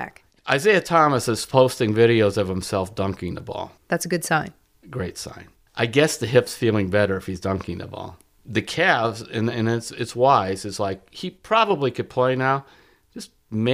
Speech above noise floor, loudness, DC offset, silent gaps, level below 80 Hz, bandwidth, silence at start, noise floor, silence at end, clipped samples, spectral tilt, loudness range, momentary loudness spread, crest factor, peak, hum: 20 dB; -21 LUFS; under 0.1%; none; -54 dBFS; 15.5 kHz; 0 s; -41 dBFS; 0 s; under 0.1%; -5 dB/octave; 5 LU; 16 LU; 20 dB; -4 dBFS; none